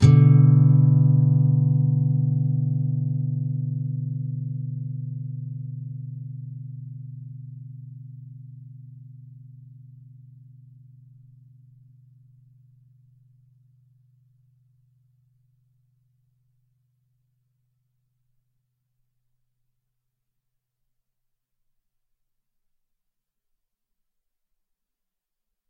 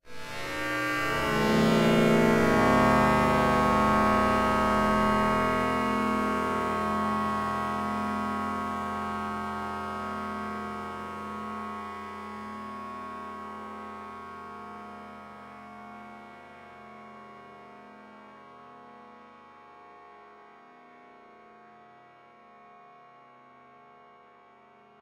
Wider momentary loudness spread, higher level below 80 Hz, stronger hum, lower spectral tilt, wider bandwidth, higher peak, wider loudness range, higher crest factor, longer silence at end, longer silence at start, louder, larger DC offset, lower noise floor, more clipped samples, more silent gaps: about the same, 27 LU vs 25 LU; second, -62 dBFS vs -50 dBFS; neither; first, -10 dB/octave vs -5.5 dB/octave; second, 7 kHz vs 16 kHz; first, -2 dBFS vs -10 dBFS; about the same, 26 LU vs 24 LU; about the same, 24 dB vs 20 dB; first, 16.45 s vs 2.25 s; about the same, 0 s vs 0.05 s; first, -21 LUFS vs -27 LUFS; neither; first, -84 dBFS vs -56 dBFS; neither; neither